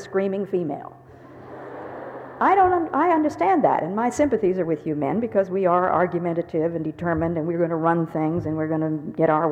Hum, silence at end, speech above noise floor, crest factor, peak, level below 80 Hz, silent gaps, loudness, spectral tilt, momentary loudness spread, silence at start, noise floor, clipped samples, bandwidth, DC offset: none; 0 s; 20 dB; 16 dB; -6 dBFS; -56 dBFS; none; -22 LUFS; -8 dB/octave; 16 LU; 0 s; -42 dBFS; under 0.1%; 9.6 kHz; under 0.1%